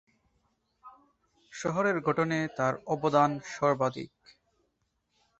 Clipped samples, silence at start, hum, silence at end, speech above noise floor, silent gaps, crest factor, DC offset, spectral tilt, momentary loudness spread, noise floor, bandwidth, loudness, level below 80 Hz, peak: under 0.1%; 0.85 s; none; 1.3 s; 49 dB; none; 22 dB; under 0.1%; -6 dB/octave; 12 LU; -77 dBFS; 8.2 kHz; -29 LUFS; -68 dBFS; -10 dBFS